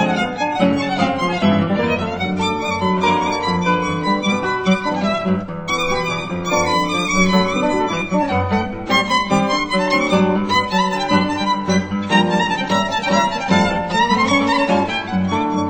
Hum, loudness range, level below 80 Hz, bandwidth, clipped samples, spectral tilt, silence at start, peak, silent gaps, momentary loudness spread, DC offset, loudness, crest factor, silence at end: none; 2 LU; -42 dBFS; over 20 kHz; under 0.1%; -5 dB/octave; 0 s; -2 dBFS; none; 5 LU; under 0.1%; -17 LUFS; 16 dB; 0 s